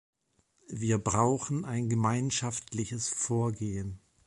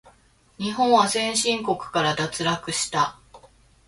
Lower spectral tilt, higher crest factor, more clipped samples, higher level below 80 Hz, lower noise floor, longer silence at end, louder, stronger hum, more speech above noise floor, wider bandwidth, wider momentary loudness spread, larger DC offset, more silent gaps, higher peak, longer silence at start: first, -5 dB/octave vs -3 dB/octave; about the same, 18 dB vs 20 dB; neither; about the same, -56 dBFS vs -58 dBFS; first, -72 dBFS vs -58 dBFS; about the same, 0.3 s vs 0.4 s; second, -31 LUFS vs -23 LUFS; neither; first, 42 dB vs 35 dB; about the same, 11.5 kHz vs 12 kHz; about the same, 8 LU vs 7 LU; neither; neither; second, -14 dBFS vs -6 dBFS; first, 0.7 s vs 0.05 s